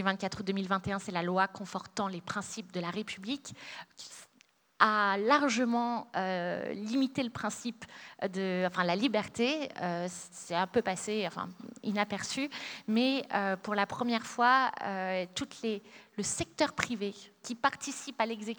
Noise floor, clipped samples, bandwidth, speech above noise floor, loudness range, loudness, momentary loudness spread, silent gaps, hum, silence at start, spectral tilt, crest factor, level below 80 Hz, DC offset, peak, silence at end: -67 dBFS; under 0.1%; over 20 kHz; 34 dB; 4 LU; -32 LUFS; 14 LU; none; none; 0 s; -4 dB/octave; 24 dB; -70 dBFS; under 0.1%; -8 dBFS; 0 s